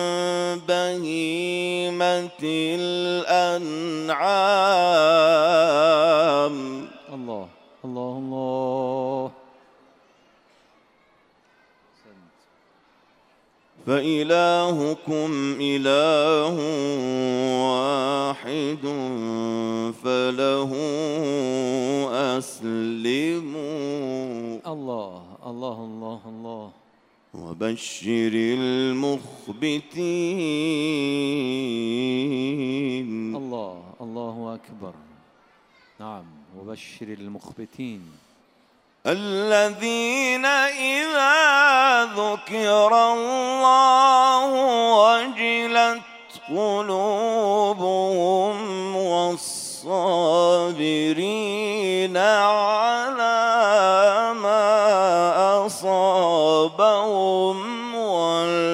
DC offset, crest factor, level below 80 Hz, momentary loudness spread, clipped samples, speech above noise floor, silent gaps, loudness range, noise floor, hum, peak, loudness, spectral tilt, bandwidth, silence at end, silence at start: under 0.1%; 18 dB; -74 dBFS; 18 LU; under 0.1%; 39 dB; none; 15 LU; -60 dBFS; none; -4 dBFS; -21 LUFS; -4 dB/octave; 15.5 kHz; 0 s; 0 s